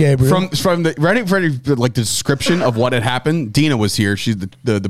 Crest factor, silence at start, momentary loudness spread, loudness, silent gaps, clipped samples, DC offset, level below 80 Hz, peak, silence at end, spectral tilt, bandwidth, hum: 14 dB; 0 s; 3 LU; -16 LUFS; none; under 0.1%; 1%; -42 dBFS; -2 dBFS; 0 s; -5.5 dB/octave; 16 kHz; none